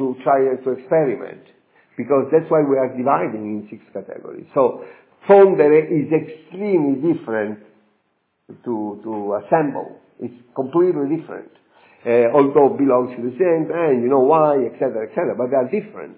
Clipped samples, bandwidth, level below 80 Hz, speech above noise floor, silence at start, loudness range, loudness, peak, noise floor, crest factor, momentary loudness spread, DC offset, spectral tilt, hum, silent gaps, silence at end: under 0.1%; 4 kHz; -74 dBFS; 50 dB; 0 s; 7 LU; -18 LUFS; 0 dBFS; -68 dBFS; 18 dB; 19 LU; under 0.1%; -12 dB/octave; none; none; 0.05 s